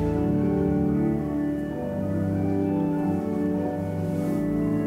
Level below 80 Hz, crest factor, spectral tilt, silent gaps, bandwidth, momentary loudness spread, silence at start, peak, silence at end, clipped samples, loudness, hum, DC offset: -44 dBFS; 12 dB; -9.5 dB/octave; none; 14.5 kHz; 5 LU; 0 s; -12 dBFS; 0 s; under 0.1%; -26 LUFS; none; under 0.1%